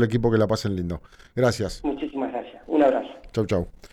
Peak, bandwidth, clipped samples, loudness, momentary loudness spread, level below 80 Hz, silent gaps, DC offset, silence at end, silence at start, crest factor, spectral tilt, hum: -8 dBFS; 14 kHz; under 0.1%; -25 LUFS; 11 LU; -44 dBFS; none; under 0.1%; 0.05 s; 0 s; 16 dB; -7 dB/octave; none